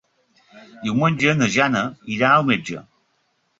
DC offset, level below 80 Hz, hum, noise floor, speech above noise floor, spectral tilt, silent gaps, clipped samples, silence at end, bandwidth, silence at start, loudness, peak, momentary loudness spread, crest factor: under 0.1%; -58 dBFS; none; -67 dBFS; 48 dB; -5 dB/octave; none; under 0.1%; 0.8 s; 7.8 kHz; 0.55 s; -19 LUFS; -2 dBFS; 13 LU; 20 dB